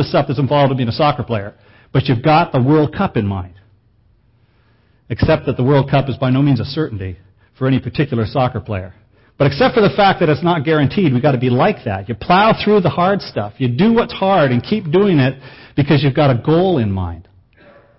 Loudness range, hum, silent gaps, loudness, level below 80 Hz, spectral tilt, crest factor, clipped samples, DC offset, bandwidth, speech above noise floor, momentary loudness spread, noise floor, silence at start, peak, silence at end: 5 LU; none; none; -15 LUFS; -40 dBFS; -12 dB/octave; 14 dB; under 0.1%; under 0.1%; 5.8 kHz; 40 dB; 11 LU; -54 dBFS; 0 s; -2 dBFS; 0.75 s